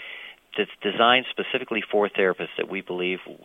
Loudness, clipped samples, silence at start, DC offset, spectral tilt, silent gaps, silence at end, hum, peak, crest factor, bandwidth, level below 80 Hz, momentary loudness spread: -24 LUFS; under 0.1%; 0 s; under 0.1%; -6 dB/octave; none; 0.1 s; none; -4 dBFS; 22 dB; 10.5 kHz; -68 dBFS; 11 LU